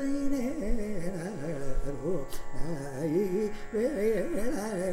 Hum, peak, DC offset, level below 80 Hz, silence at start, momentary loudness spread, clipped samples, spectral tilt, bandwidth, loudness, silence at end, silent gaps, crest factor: none; -16 dBFS; under 0.1%; -38 dBFS; 0 s; 8 LU; under 0.1%; -6.5 dB/octave; 14.5 kHz; -33 LUFS; 0 s; none; 12 dB